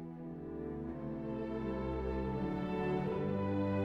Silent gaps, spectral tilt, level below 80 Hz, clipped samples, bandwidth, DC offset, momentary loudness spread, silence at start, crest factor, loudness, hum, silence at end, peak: none; -9.5 dB/octave; -50 dBFS; under 0.1%; 6.2 kHz; under 0.1%; 8 LU; 0 s; 12 dB; -38 LUFS; none; 0 s; -24 dBFS